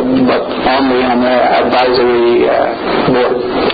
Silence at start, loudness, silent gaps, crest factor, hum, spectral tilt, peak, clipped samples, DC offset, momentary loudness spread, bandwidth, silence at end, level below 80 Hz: 0 s; -11 LUFS; none; 10 dB; none; -8 dB/octave; 0 dBFS; under 0.1%; under 0.1%; 4 LU; 5 kHz; 0 s; -40 dBFS